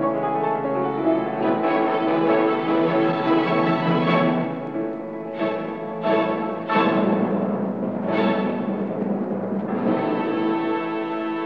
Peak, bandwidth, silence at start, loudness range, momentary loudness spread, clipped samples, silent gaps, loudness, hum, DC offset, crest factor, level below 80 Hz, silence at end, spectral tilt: -6 dBFS; 5.6 kHz; 0 s; 3 LU; 7 LU; under 0.1%; none; -22 LUFS; none; 0.2%; 16 dB; -66 dBFS; 0 s; -9 dB/octave